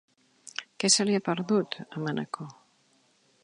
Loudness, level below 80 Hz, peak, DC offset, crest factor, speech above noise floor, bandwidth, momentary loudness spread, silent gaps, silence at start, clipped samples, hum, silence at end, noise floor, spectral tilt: -27 LUFS; -78 dBFS; -8 dBFS; under 0.1%; 24 dB; 39 dB; 11 kHz; 17 LU; none; 0.6 s; under 0.1%; none; 0.9 s; -66 dBFS; -3.5 dB/octave